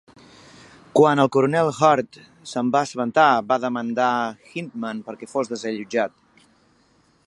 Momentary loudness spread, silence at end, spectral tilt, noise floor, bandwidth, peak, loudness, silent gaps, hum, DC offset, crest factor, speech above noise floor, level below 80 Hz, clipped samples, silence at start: 14 LU; 1.2 s; -5.5 dB/octave; -60 dBFS; 11.5 kHz; -2 dBFS; -21 LUFS; none; none; under 0.1%; 20 dB; 39 dB; -68 dBFS; under 0.1%; 0.95 s